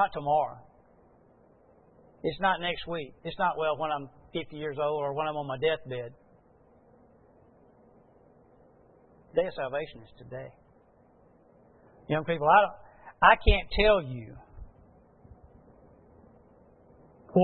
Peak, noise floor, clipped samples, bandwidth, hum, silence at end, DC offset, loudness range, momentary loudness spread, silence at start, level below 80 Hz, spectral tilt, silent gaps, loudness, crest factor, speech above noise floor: -4 dBFS; -61 dBFS; under 0.1%; 4.4 kHz; none; 0 s; under 0.1%; 12 LU; 21 LU; 0 s; -42 dBFS; -9 dB/octave; none; -28 LUFS; 28 dB; 33 dB